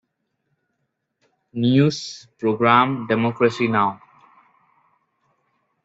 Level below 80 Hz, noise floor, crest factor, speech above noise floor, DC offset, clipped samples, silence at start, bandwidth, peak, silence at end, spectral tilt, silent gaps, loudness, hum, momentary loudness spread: -64 dBFS; -75 dBFS; 20 dB; 56 dB; under 0.1%; under 0.1%; 1.55 s; 8 kHz; -2 dBFS; 1.9 s; -6.5 dB/octave; none; -19 LUFS; none; 16 LU